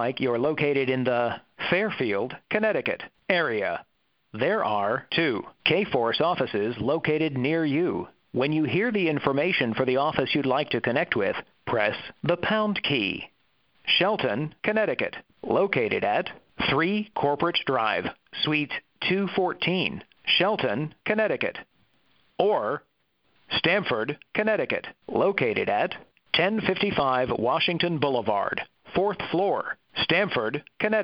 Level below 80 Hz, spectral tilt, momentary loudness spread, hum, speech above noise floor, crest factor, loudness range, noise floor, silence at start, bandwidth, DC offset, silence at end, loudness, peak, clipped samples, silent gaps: -60 dBFS; -8.5 dB/octave; 7 LU; none; 44 dB; 22 dB; 2 LU; -69 dBFS; 0 s; 5.8 kHz; under 0.1%; 0 s; -25 LUFS; -4 dBFS; under 0.1%; none